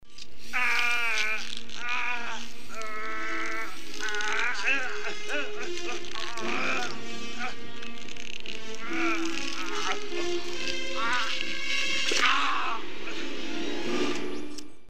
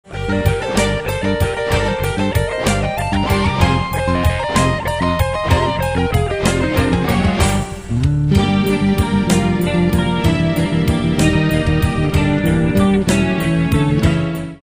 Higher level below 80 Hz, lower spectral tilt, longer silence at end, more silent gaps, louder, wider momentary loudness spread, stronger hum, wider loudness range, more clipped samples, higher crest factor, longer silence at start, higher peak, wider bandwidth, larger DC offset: second, -60 dBFS vs -26 dBFS; second, -2 dB/octave vs -6 dB/octave; about the same, 0 s vs 0.05 s; neither; second, -30 LUFS vs -16 LUFS; first, 13 LU vs 4 LU; neither; first, 5 LU vs 2 LU; neither; first, 24 dB vs 16 dB; about the same, 0 s vs 0.1 s; second, -8 dBFS vs 0 dBFS; about the same, 16 kHz vs 16 kHz; first, 5% vs under 0.1%